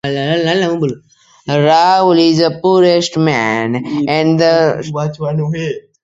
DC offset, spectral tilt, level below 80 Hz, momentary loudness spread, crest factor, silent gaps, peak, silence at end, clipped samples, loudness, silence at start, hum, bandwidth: under 0.1%; -6 dB/octave; -52 dBFS; 10 LU; 12 dB; none; 0 dBFS; 0.25 s; under 0.1%; -13 LUFS; 0.05 s; none; 7.8 kHz